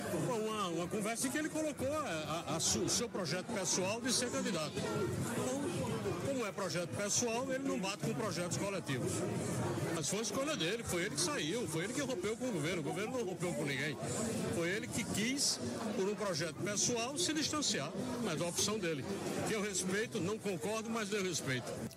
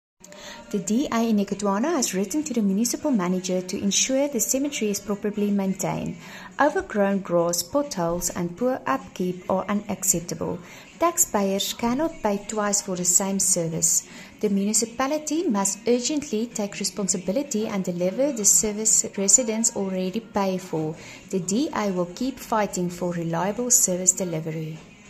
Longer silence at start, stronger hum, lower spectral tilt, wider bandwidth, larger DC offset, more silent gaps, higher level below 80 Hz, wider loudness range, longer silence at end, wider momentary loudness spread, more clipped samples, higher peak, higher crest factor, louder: second, 0 s vs 0.3 s; neither; about the same, -3.5 dB/octave vs -3.5 dB/octave; about the same, 16 kHz vs 15 kHz; neither; neither; second, -70 dBFS vs -54 dBFS; about the same, 2 LU vs 4 LU; about the same, 0 s vs 0 s; second, 5 LU vs 10 LU; neither; second, -22 dBFS vs -4 dBFS; second, 14 dB vs 20 dB; second, -36 LUFS vs -23 LUFS